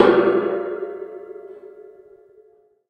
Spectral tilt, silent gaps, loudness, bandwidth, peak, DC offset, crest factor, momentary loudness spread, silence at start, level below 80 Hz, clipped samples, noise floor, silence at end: -7.5 dB/octave; none; -21 LUFS; 5.6 kHz; 0 dBFS; under 0.1%; 22 dB; 25 LU; 0 s; -64 dBFS; under 0.1%; -55 dBFS; 1.05 s